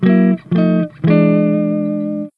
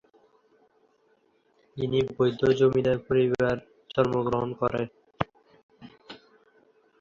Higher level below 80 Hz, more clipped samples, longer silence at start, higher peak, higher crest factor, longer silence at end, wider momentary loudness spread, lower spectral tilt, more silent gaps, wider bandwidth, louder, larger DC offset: about the same, -54 dBFS vs -56 dBFS; neither; second, 0 s vs 1.75 s; first, 0 dBFS vs -6 dBFS; second, 14 dB vs 22 dB; second, 0.1 s vs 0.85 s; second, 7 LU vs 21 LU; first, -11 dB/octave vs -7.5 dB/octave; second, none vs 5.63-5.69 s; second, 4.8 kHz vs 7.2 kHz; first, -15 LUFS vs -26 LUFS; neither